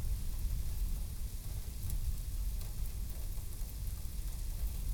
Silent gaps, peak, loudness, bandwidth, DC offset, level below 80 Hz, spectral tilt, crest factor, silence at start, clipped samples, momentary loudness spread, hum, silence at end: none; -20 dBFS; -42 LUFS; over 20 kHz; under 0.1%; -38 dBFS; -4.5 dB/octave; 16 dB; 0 s; under 0.1%; 4 LU; none; 0 s